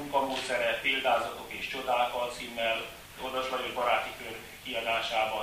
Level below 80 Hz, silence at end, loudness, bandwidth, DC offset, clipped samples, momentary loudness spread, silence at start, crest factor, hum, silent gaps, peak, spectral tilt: -60 dBFS; 0 s; -31 LUFS; 15.5 kHz; under 0.1%; under 0.1%; 10 LU; 0 s; 18 dB; none; none; -14 dBFS; -2.5 dB/octave